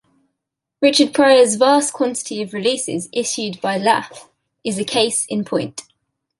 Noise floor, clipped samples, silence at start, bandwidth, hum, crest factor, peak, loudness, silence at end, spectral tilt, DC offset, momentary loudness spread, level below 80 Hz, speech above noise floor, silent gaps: -80 dBFS; under 0.1%; 0.8 s; 11.5 kHz; none; 18 dB; -2 dBFS; -17 LUFS; 0.6 s; -3 dB/octave; under 0.1%; 13 LU; -66 dBFS; 63 dB; none